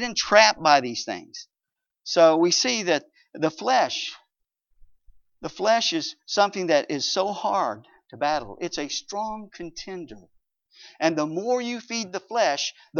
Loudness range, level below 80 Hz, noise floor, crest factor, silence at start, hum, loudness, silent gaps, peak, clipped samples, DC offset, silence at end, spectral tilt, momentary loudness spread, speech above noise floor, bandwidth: 7 LU; -62 dBFS; -86 dBFS; 24 dB; 0 s; none; -23 LUFS; none; 0 dBFS; under 0.1%; under 0.1%; 0 s; -2.5 dB/octave; 19 LU; 62 dB; 7.4 kHz